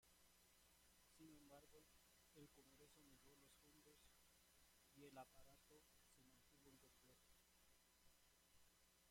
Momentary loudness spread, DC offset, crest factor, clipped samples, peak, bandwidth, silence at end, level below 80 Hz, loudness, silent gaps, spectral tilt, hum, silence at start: 6 LU; under 0.1%; 22 dB; under 0.1%; -50 dBFS; 16.5 kHz; 0 s; -84 dBFS; -67 LUFS; none; -3 dB/octave; none; 0 s